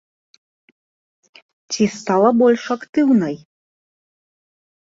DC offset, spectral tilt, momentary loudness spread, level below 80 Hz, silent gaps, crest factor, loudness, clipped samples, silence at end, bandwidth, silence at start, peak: under 0.1%; -5.5 dB/octave; 13 LU; -62 dBFS; 2.89-2.93 s; 18 dB; -17 LUFS; under 0.1%; 1.5 s; 7.8 kHz; 1.7 s; -2 dBFS